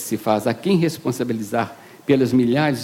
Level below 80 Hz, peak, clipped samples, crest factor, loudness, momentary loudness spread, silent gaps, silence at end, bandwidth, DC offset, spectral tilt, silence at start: -60 dBFS; -6 dBFS; under 0.1%; 14 dB; -20 LUFS; 7 LU; none; 0 s; 16.5 kHz; under 0.1%; -6 dB/octave; 0 s